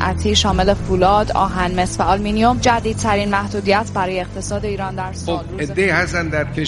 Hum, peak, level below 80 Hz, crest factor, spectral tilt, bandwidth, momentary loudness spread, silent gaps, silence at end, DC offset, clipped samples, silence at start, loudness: none; 0 dBFS; -30 dBFS; 16 dB; -4.5 dB/octave; 11.5 kHz; 9 LU; none; 0 s; under 0.1%; under 0.1%; 0 s; -18 LUFS